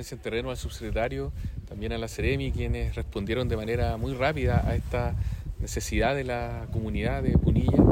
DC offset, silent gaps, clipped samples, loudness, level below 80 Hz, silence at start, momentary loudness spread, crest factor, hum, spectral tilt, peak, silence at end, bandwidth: under 0.1%; none; under 0.1%; -29 LUFS; -34 dBFS; 0 s; 10 LU; 20 dB; none; -6.5 dB/octave; -6 dBFS; 0 s; 16 kHz